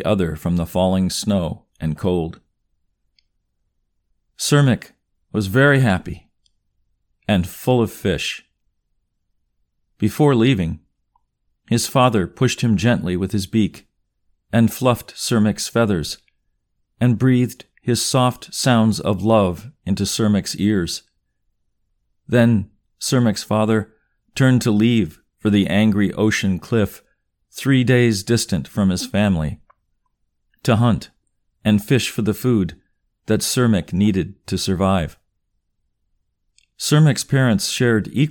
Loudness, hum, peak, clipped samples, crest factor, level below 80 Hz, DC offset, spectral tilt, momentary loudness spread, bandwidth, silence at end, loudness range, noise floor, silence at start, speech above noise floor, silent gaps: -19 LUFS; none; -2 dBFS; under 0.1%; 18 dB; -46 dBFS; under 0.1%; -5.5 dB/octave; 10 LU; 19 kHz; 0 s; 5 LU; -70 dBFS; 0 s; 53 dB; none